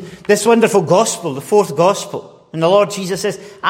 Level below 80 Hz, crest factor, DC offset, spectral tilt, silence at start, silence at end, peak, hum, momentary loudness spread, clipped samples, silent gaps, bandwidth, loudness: -60 dBFS; 14 dB; under 0.1%; -4.5 dB/octave; 0 s; 0 s; 0 dBFS; none; 11 LU; under 0.1%; none; 16.5 kHz; -15 LUFS